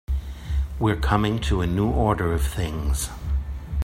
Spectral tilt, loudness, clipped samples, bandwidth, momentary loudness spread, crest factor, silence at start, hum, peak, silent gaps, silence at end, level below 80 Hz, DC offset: -6 dB/octave; -25 LUFS; under 0.1%; 15.5 kHz; 8 LU; 20 dB; 0.1 s; none; -4 dBFS; none; 0 s; -28 dBFS; under 0.1%